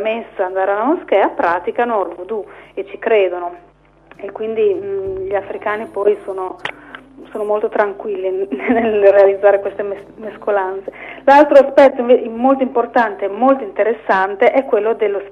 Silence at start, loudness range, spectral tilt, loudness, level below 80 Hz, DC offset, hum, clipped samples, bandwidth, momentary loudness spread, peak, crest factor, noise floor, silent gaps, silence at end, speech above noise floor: 0 s; 8 LU; -6 dB/octave; -15 LUFS; -54 dBFS; under 0.1%; none; under 0.1%; 7.2 kHz; 15 LU; 0 dBFS; 16 dB; -46 dBFS; none; 0 s; 31 dB